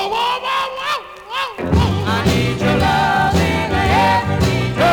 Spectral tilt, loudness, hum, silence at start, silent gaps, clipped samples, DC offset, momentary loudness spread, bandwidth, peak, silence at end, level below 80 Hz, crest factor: -5.5 dB/octave; -17 LUFS; none; 0 s; none; under 0.1%; under 0.1%; 8 LU; 19.5 kHz; -2 dBFS; 0 s; -32 dBFS; 14 dB